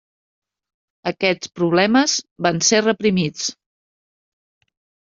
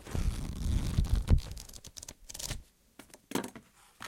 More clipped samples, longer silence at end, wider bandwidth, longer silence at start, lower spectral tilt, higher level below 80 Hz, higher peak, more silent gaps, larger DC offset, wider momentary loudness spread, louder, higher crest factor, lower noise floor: neither; first, 1.55 s vs 0 s; second, 7.6 kHz vs 17 kHz; first, 1.05 s vs 0 s; second, -3.5 dB/octave vs -5 dB/octave; second, -60 dBFS vs -36 dBFS; first, -2 dBFS vs -10 dBFS; first, 2.31-2.36 s vs none; neither; second, 11 LU vs 16 LU; first, -18 LUFS vs -36 LUFS; about the same, 18 dB vs 22 dB; first, under -90 dBFS vs -58 dBFS